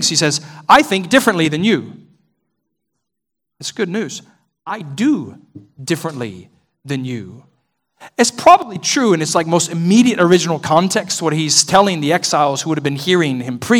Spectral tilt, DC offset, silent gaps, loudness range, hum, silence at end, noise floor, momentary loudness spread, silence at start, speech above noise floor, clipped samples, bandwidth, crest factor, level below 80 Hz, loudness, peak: -4 dB/octave; under 0.1%; none; 10 LU; none; 0 s; -81 dBFS; 16 LU; 0 s; 66 dB; 0.3%; 18.5 kHz; 16 dB; -56 dBFS; -15 LUFS; 0 dBFS